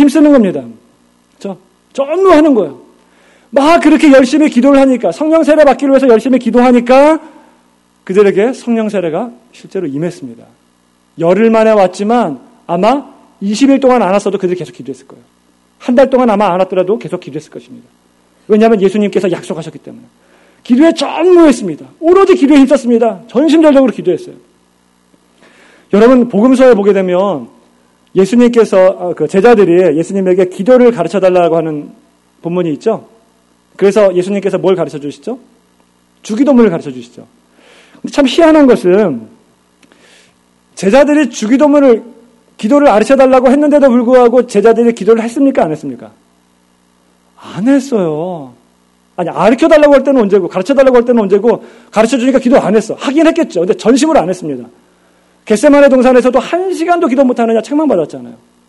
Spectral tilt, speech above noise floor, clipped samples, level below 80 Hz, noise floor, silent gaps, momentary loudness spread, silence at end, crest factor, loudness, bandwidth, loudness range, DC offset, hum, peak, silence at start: -6 dB/octave; 43 dB; 1%; -46 dBFS; -52 dBFS; none; 15 LU; 0.35 s; 10 dB; -9 LUFS; 12 kHz; 6 LU; under 0.1%; 60 Hz at -35 dBFS; 0 dBFS; 0 s